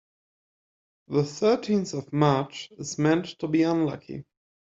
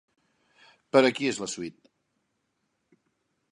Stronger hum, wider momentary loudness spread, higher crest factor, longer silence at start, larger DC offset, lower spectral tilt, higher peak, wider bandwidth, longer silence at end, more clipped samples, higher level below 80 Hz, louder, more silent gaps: neither; about the same, 13 LU vs 15 LU; second, 20 dB vs 26 dB; first, 1.1 s vs 0.95 s; neither; first, -6 dB/octave vs -4 dB/octave; about the same, -6 dBFS vs -4 dBFS; second, 7.8 kHz vs 11 kHz; second, 0.45 s vs 1.8 s; neither; first, -64 dBFS vs -74 dBFS; about the same, -26 LUFS vs -26 LUFS; neither